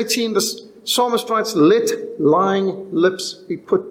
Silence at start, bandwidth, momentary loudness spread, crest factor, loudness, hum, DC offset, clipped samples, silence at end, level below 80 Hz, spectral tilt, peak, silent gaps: 0 s; 17 kHz; 10 LU; 14 dB; -18 LUFS; none; under 0.1%; under 0.1%; 0 s; -66 dBFS; -4 dB/octave; -4 dBFS; none